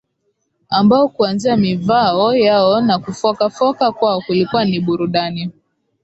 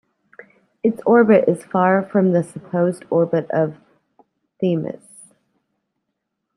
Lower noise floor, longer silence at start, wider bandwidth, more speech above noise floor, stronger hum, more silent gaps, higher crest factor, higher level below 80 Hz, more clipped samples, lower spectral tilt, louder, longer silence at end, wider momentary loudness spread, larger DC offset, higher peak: second, -68 dBFS vs -77 dBFS; second, 0.7 s vs 0.85 s; second, 8.2 kHz vs 11.5 kHz; second, 53 dB vs 60 dB; neither; neither; about the same, 14 dB vs 18 dB; first, -54 dBFS vs -68 dBFS; neither; second, -6.5 dB/octave vs -8.5 dB/octave; first, -15 LUFS vs -18 LUFS; second, 0.5 s vs 1.65 s; second, 7 LU vs 10 LU; neither; about the same, -2 dBFS vs -2 dBFS